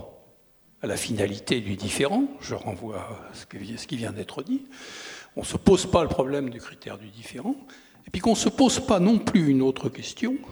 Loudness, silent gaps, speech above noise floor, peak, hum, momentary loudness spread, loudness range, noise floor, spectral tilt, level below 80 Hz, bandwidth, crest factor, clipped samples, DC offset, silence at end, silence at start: -25 LUFS; none; 33 dB; -2 dBFS; none; 19 LU; 7 LU; -58 dBFS; -5 dB/octave; -50 dBFS; 19.5 kHz; 24 dB; under 0.1%; under 0.1%; 0 s; 0 s